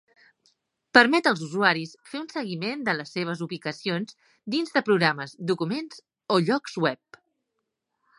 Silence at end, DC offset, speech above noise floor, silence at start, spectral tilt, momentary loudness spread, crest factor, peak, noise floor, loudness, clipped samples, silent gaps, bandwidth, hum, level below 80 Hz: 1.25 s; under 0.1%; 55 dB; 0.95 s; -5 dB/octave; 15 LU; 26 dB; -2 dBFS; -81 dBFS; -25 LUFS; under 0.1%; none; 11.5 kHz; none; -72 dBFS